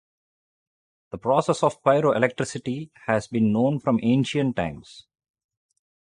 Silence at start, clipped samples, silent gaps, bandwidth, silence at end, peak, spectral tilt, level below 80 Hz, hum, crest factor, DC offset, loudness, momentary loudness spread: 1.15 s; under 0.1%; none; 11 kHz; 1.05 s; -4 dBFS; -6.5 dB/octave; -56 dBFS; none; 20 dB; under 0.1%; -23 LUFS; 11 LU